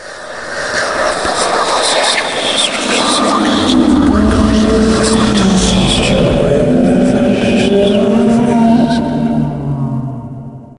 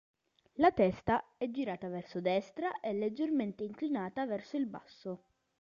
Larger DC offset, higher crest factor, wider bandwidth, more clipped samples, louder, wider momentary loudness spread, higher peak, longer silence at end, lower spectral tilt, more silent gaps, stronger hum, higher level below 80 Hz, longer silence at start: neither; second, 12 dB vs 20 dB; first, 11.5 kHz vs 7.4 kHz; neither; first, -11 LUFS vs -35 LUFS; second, 8 LU vs 15 LU; first, 0 dBFS vs -14 dBFS; second, 0.1 s vs 0.45 s; second, -4.5 dB/octave vs -7.5 dB/octave; neither; neither; first, -26 dBFS vs -64 dBFS; second, 0 s vs 0.55 s